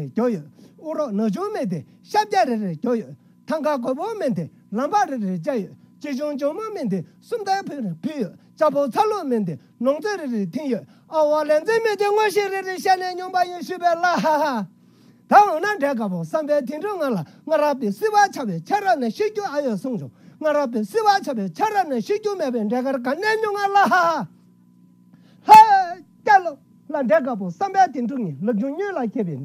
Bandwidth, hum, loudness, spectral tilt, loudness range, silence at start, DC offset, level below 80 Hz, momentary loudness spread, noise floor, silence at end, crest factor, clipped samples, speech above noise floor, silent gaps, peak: 16 kHz; none; -21 LUFS; -5.5 dB/octave; 8 LU; 0 s; under 0.1%; -74 dBFS; 11 LU; -53 dBFS; 0 s; 20 dB; under 0.1%; 31 dB; none; 0 dBFS